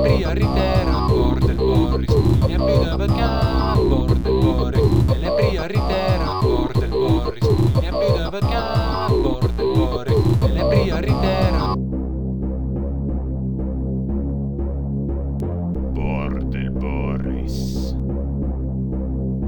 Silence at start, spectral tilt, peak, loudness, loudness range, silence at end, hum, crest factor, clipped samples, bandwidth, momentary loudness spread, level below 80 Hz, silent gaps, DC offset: 0 s; -8 dB/octave; -4 dBFS; -20 LUFS; 6 LU; 0 s; none; 14 dB; under 0.1%; 19.5 kHz; 7 LU; -24 dBFS; none; under 0.1%